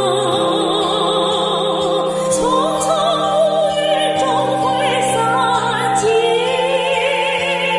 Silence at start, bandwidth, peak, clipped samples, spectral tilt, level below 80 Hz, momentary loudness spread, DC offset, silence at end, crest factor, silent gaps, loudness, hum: 0 s; 11.5 kHz; -4 dBFS; under 0.1%; -3.5 dB/octave; -52 dBFS; 2 LU; under 0.1%; 0 s; 12 dB; none; -16 LUFS; none